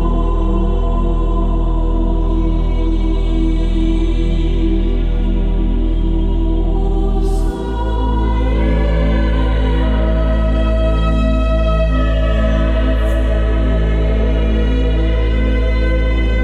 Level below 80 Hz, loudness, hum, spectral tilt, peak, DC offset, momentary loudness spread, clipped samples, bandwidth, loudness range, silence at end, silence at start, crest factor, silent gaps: -14 dBFS; -17 LUFS; none; -8 dB/octave; -4 dBFS; under 0.1%; 3 LU; under 0.1%; 4.7 kHz; 2 LU; 0 s; 0 s; 10 dB; none